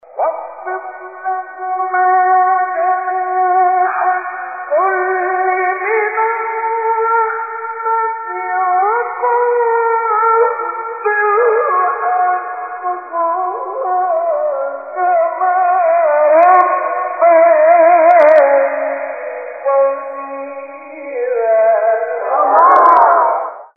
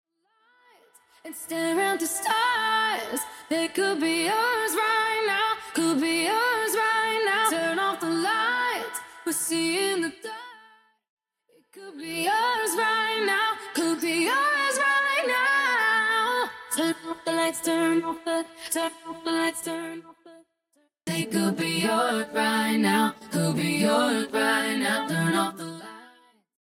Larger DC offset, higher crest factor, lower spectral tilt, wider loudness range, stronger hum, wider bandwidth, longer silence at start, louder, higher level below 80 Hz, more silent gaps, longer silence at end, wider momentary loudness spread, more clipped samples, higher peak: first, 0.1% vs under 0.1%; about the same, 14 dB vs 18 dB; first, -5.5 dB/octave vs -3 dB/octave; about the same, 6 LU vs 6 LU; neither; second, 4 kHz vs 16.5 kHz; second, 0.15 s vs 1.25 s; first, -13 LUFS vs -25 LUFS; about the same, -74 dBFS vs -74 dBFS; second, none vs 11.10-11.17 s; second, 0.1 s vs 0.6 s; first, 14 LU vs 10 LU; neither; first, 0 dBFS vs -8 dBFS